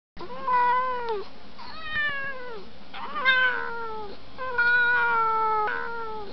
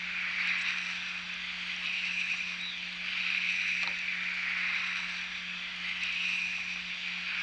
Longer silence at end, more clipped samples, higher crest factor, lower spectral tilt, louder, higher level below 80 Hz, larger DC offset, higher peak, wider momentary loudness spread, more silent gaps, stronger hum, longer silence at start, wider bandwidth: about the same, 0 s vs 0 s; neither; about the same, 16 dB vs 18 dB; first, -4.5 dB/octave vs -0.5 dB/octave; first, -25 LUFS vs -31 LUFS; first, -56 dBFS vs -68 dBFS; first, 2% vs under 0.1%; first, -10 dBFS vs -16 dBFS; first, 20 LU vs 6 LU; neither; neither; first, 0.15 s vs 0 s; second, 6.2 kHz vs 10.5 kHz